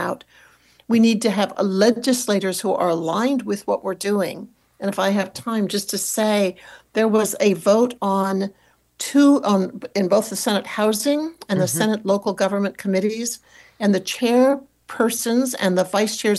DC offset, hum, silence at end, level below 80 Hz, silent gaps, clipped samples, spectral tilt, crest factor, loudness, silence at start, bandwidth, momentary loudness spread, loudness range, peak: under 0.1%; none; 0 s; -66 dBFS; none; under 0.1%; -4.5 dB/octave; 14 dB; -20 LUFS; 0 s; 13 kHz; 8 LU; 3 LU; -6 dBFS